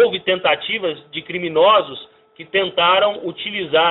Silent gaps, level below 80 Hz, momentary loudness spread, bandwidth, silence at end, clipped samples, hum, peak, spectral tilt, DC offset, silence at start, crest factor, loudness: none; -62 dBFS; 12 LU; 4.1 kHz; 0 s; under 0.1%; none; -4 dBFS; -0.5 dB/octave; under 0.1%; 0 s; 14 dB; -17 LUFS